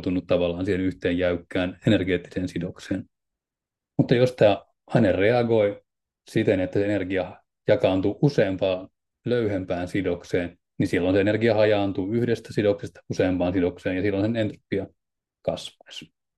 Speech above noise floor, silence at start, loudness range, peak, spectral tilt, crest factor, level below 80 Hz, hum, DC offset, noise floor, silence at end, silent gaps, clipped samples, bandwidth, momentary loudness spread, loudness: 65 dB; 0 s; 4 LU; -6 dBFS; -7.5 dB/octave; 18 dB; -58 dBFS; none; under 0.1%; -88 dBFS; 0.3 s; none; under 0.1%; 12 kHz; 12 LU; -24 LUFS